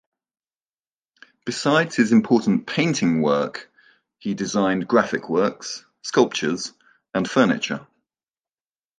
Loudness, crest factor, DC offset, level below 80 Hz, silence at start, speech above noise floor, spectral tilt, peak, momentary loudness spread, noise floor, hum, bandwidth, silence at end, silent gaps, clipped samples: -21 LUFS; 20 dB; under 0.1%; -64 dBFS; 1.45 s; over 70 dB; -5 dB/octave; -2 dBFS; 14 LU; under -90 dBFS; none; 9.6 kHz; 1.15 s; none; under 0.1%